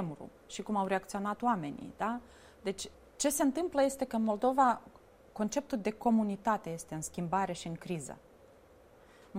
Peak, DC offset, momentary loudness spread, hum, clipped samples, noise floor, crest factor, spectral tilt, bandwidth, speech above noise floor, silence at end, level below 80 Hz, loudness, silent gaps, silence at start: -16 dBFS; under 0.1%; 13 LU; none; under 0.1%; -60 dBFS; 20 dB; -5 dB/octave; 16 kHz; 26 dB; 0 s; -64 dBFS; -34 LUFS; none; 0 s